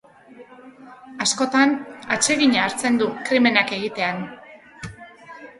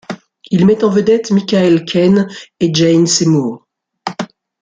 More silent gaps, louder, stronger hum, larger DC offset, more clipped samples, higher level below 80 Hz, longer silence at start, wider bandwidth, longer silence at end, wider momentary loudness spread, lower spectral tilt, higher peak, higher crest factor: neither; second, -20 LUFS vs -13 LUFS; neither; neither; neither; second, -60 dBFS vs -52 dBFS; first, 0.4 s vs 0.1 s; first, 11.5 kHz vs 9.6 kHz; second, 0.1 s vs 0.35 s; first, 21 LU vs 16 LU; second, -2.5 dB/octave vs -5.5 dB/octave; about the same, 0 dBFS vs -2 dBFS; first, 22 dB vs 12 dB